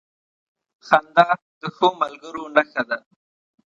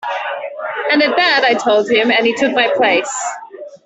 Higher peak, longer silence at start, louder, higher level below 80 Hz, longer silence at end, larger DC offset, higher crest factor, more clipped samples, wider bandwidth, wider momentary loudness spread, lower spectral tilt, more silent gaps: about the same, 0 dBFS vs -2 dBFS; first, 0.85 s vs 0 s; second, -20 LUFS vs -14 LUFS; second, -70 dBFS vs -62 dBFS; first, 0.7 s vs 0.1 s; neither; first, 22 dB vs 14 dB; neither; about the same, 8.2 kHz vs 8.4 kHz; about the same, 12 LU vs 12 LU; first, -5 dB/octave vs -2 dB/octave; first, 1.42-1.61 s vs none